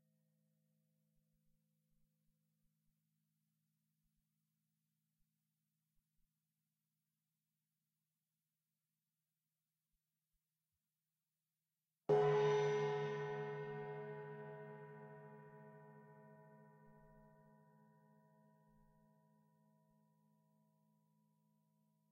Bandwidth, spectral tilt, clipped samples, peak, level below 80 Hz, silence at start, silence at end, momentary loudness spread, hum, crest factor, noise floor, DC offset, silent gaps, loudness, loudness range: 6.6 kHz; -6.5 dB/octave; under 0.1%; -24 dBFS; -88 dBFS; 12.1 s; 4.9 s; 26 LU; none; 24 dB; under -90 dBFS; under 0.1%; none; -40 LUFS; 20 LU